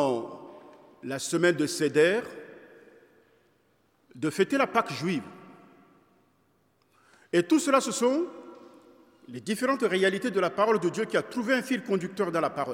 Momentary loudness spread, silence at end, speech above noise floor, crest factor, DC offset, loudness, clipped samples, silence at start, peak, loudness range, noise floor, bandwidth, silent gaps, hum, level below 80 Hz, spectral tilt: 19 LU; 0 s; 42 dB; 22 dB; under 0.1%; -27 LUFS; under 0.1%; 0 s; -8 dBFS; 4 LU; -68 dBFS; 16.5 kHz; none; none; -80 dBFS; -4.5 dB/octave